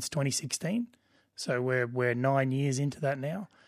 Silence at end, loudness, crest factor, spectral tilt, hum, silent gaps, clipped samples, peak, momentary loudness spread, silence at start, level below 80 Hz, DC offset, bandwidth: 0.2 s; -31 LUFS; 18 dB; -5 dB/octave; none; none; under 0.1%; -12 dBFS; 9 LU; 0 s; -72 dBFS; under 0.1%; 15.5 kHz